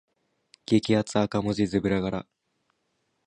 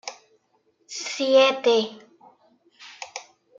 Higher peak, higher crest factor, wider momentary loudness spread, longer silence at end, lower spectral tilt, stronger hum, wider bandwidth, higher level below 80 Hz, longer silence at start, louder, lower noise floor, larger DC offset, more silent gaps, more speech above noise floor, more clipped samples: about the same, -8 dBFS vs -6 dBFS; about the same, 20 dB vs 20 dB; second, 10 LU vs 21 LU; first, 1.05 s vs 0.35 s; first, -6.5 dB/octave vs -2 dB/octave; neither; first, 10.5 kHz vs 7.8 kHz; first, -54 dBFS vs -84 dBFS; first, 0.7 s vs 0.05 s; second, -26 LUFS vs -21 LUFS; first, -75 dBFS vs -67 dBFS; neither; neither; about the same, 50 dB vs 47 dB; neither